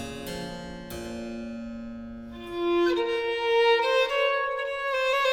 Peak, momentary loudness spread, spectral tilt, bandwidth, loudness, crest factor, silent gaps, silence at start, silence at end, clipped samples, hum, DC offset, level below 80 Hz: -10 dBFS; 17 LU; -4 dB/octave; 17.5 kHz; -26 LUFS; 16 dB; none; 0 s; 0 s; under 0.1%; none; under 0.1%; -52 dBFS